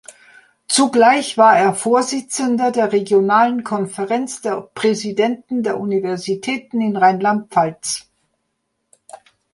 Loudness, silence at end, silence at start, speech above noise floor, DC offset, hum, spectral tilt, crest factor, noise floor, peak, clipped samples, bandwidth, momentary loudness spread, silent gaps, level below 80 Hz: -17 LUFS; 0.4 s; 0.7 s; 56 dB; under 0.1%; none; -4 dB/octave; 16 dB; -72 dBFS; -2 dBFS; under 0.1%; 11.5 kHz; 10 LU; none; -66 dBFS